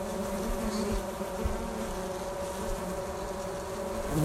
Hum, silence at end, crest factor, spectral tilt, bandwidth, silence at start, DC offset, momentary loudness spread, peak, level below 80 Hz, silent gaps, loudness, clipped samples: none; 0 s; 16 dB; -5 dB/octave; 16 kHz; 0 s; under 0.1%; 4 LU; -16 dBFS; -40 dBFS; none; -34 LUFS; under 0.1%